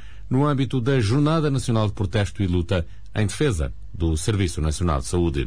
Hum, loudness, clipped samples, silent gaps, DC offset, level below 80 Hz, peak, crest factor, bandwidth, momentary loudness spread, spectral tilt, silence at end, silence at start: none; -23 LUFS; under 0.1%; none; 2%; -34 dBFS; -10 dBFS; 12 dB; 10.5 kHz; 6 LU; -6.5 dB/octave; 0 s; 0 s